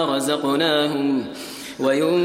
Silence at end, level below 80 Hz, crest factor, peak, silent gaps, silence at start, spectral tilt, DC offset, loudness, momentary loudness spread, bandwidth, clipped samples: 0 s; -64 dBFS; 14 dB; -6 dBFS; none; 0 s; -4.5 dB/octave; under 0.1%; -21 LUFS; 13 LU; 16 kHz; under 0.1%